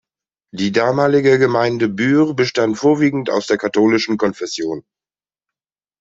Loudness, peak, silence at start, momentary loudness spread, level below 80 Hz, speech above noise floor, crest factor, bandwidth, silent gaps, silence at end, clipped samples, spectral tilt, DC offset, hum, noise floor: -16 LUFS; -2 dBFS; 0.55 s; 10 LU; -58 dBFS; over 74 dB; 14 dB; 8 kHz; none; 1.2 s; under 0.1%; -5.5 dB/octave; under 0.1%; none; under -90 dBFS